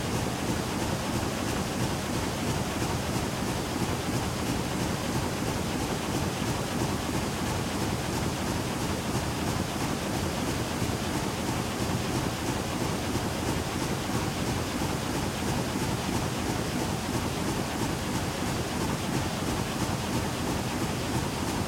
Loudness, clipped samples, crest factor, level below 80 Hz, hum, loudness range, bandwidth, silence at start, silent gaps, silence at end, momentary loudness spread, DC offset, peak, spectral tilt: -30 LUFS; under 0.1%; 16 dB; -44 dBFS; none; 0 LU; 16.5 kHz; 0 s; none; 0 s; 1 LU; under 0.1%; -14 dBFS; -4.5 dB/octave